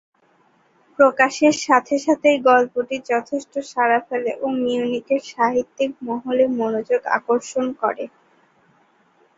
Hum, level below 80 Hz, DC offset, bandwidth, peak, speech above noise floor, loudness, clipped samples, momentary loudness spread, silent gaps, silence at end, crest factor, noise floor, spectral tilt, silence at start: none; -66 dBFS; under 0.1%; 7.8 kHz; -2 dBFS; 40 dB; -20 LUFS; under 0.1%; 10 LU; none; 1.3 s; 18 dB; -59 dBFS; -3.5 dB/octave; 1 s